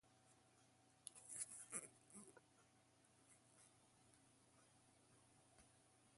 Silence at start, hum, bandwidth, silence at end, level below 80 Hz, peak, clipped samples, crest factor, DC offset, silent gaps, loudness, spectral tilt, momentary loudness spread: 0.05 s; none; 11.5 kHz; 0 s; under -90 dBFS; -32 dBFS; under 0.1%; 32 dB; under 0.1%; none; -55 LUFS; -1.5 dB/octave; 13 LU